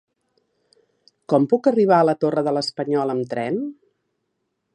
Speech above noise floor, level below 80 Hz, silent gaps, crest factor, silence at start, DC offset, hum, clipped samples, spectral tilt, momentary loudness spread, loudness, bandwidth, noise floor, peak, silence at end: 56 dB; -72 dBFS; none; 18 dB; 1.3 s; under 0.1%; none; under 0.1%; -7 dB/octave; 9 LU; -20 LUFS; 11 kHz; -75 dBFS; -4 dBFS; 1 s